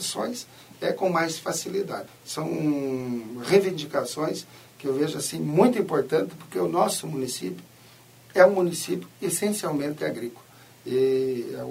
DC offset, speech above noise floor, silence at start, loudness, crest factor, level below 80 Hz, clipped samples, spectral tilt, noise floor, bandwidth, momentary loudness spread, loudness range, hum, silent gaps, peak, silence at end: under 0.1%; 26 dB; 0 s; -26 LUFS; 22 dB; -70 dBFS; under 0.1%; -4.5 dB/octave; -52 dBFS; 16 kHz; 14 LU; 3 LU; none; none; -4 dBFS; 0 s